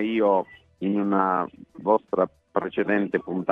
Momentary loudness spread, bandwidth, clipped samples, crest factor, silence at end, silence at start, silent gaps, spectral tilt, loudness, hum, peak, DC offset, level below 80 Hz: 9 LU; 4.4 kHz; under 0.1%; 18 dB; 0 s; 0 s; none; -9 dB/octave; -25 LUFS; none; -6 dBFS; under 0.1%; -66 dBFS